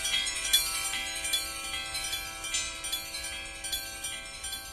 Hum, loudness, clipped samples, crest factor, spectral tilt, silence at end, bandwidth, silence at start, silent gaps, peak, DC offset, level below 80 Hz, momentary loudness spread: none; -30 LUFS; under 0.1%; 24 dB; 1 dB/octave; 0 s; 14 kHz; 0 s; none; -10 dBFS; under 0.1%; -52 dBFS; 11 LU